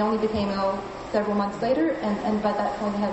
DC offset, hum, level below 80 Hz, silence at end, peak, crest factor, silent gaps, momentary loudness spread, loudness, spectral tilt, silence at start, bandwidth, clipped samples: under 0.1%; none; -50 dBFS; 0 s; -10 dBFS; 14 dB; none; 3 LU; -25 LUFS; -7 dB/octave; 0 s; 8.2 kHz; under 0.1%